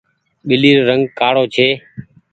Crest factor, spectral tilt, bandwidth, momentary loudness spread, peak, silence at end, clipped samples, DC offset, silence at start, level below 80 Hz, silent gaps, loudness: 14 dB; -6.5 dB/octave; 8.6 kHz; 9 LU; 0 dBFS; 0.3 s; under 0.1%; under 0.1%; 0.45 s; -56 dBFS; none; -13 LUFS